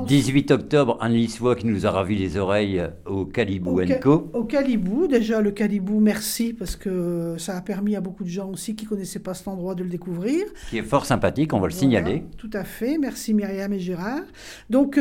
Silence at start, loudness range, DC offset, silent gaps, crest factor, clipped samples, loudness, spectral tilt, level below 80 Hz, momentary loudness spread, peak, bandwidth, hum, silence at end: 0 s; 7 LU; under 0.1%; none; 18 dB; under 0.1%; -23 LUFS; -6 dB/octave; -46 dBFS; 10 LU; -4 dBFS; 17 kHz; none; 0 s